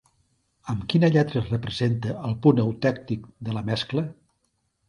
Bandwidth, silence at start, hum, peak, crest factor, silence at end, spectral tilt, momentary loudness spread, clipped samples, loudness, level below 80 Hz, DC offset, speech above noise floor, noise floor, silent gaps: 10.5 kHz; 0.65 s; none; -4 dBFS; 20 dB; 0.75 s; -7.5 dB/octave; 12 LU; under 0.1%; -24 LUFS; -52 dBFS; under 0.1%; 49 dB; -73 dBFS; none